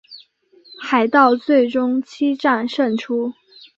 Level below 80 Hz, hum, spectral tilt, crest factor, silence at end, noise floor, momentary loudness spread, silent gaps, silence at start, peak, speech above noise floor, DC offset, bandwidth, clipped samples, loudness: -68 dBFS; none; -5.5 dB/octave; 16 dB; 0.45 s; -52 dBFS; 10 LU; none; 0.1 s; -2 dBFS; 35 dB; under 0.1%; 7.6 kHz; under 0.1%; -18 LUFS